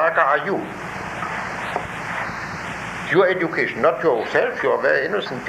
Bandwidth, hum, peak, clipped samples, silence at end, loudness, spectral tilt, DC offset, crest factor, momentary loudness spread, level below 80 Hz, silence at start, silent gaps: 15 kHz; none; -4 dBFS; under 0.1%; 0 s; -21 LUFS; -5 dB/octave; under 0.1%; 18 dB; 11 LU; -52 dBFS; 0 s; none